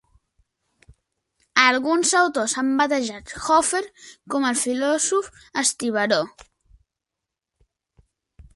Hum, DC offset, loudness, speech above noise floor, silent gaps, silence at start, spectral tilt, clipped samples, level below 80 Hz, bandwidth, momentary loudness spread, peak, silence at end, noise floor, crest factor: none; under 0.1%; -21 LUFS; 63 dB; none; 1.55 s; -1.5 dB/octave; under 0.1%; -58 dBFS; 12 kHz; 11 LU; 0 dBFS; 0.15 s; -85 dBFS; 24 dB